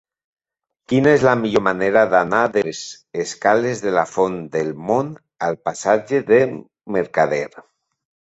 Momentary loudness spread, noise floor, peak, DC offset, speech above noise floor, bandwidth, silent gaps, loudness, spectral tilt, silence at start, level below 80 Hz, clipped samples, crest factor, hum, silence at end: 11 LU; -83 dBFS; -2 dBFS; under 0.1%; 65 dB; 8.2 kHz; none; -18 LUFS; -5.5 dB/octave; 0.9 s; -56 dBFS; under 0.1%; 18 dB; none; 0.65 s